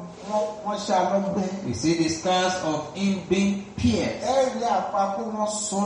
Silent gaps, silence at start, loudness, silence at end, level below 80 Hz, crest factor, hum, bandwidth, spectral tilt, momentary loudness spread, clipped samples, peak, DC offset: none; 0 s; -25 LUFS; 0 s; -50 dBFS; 14 dB; none; 10.5 kHz; -4.5 dB/octave; 5 LU; under 0.1%; -10 dBFS; under 0.1%